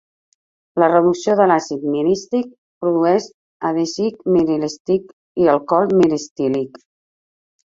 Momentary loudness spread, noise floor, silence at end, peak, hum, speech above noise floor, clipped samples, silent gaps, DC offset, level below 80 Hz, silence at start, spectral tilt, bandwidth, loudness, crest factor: 10 LU; under -90 dBFS; 1.05 s; -2 dBFS; none; over 73 dB; under 0.1%; 2.58-2.81 s, 3.34-3.60 s, 4.80-4.85 s, 5.13-5.35 s, 6.31-6.36 s; under 0.1%; -58 dBFS; 0.75 s; -6 dB/octave; 7.8 kHz; -18 LUFS; 16 dB